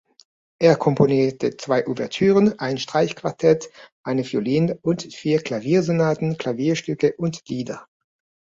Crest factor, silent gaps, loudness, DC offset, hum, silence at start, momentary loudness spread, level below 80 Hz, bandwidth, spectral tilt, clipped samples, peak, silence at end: 18 dB; 3.92-4.04 s; -21 LUFS; under 0.1%; none; 0.6 s; 10 LU; -60 dBFS; 7.8 kHz; -6.5 dB/octave; under 0.1%; -2 dBFS; 0.65 s